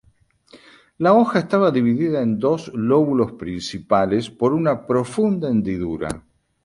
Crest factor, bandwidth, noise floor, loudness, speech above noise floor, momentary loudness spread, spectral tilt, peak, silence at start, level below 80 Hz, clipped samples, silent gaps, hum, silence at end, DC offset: 18 dB; 11.5 kHz; -58 dBFS; -20 LUFS; 39 dB; 11 LU; -7 dB/octave; -2 dBFS; 0.55 s; -50 dBFS; under 0.1%; none; none; 0.45 s; under 0.1%